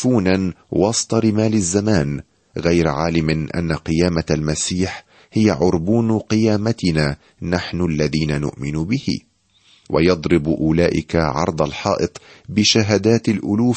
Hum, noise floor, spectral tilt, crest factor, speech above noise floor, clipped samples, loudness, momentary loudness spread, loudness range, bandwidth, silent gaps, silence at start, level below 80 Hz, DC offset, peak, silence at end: none; -55 dBFS; -5.5 dB/octave; 16 dB; 37 dB; under 0.1%; -18 LUFS; 8 LU; 3 LU; 8.8 kHz; none; 0 s; -38 dBFS; under 0.1%; -2 dBFS; 0 s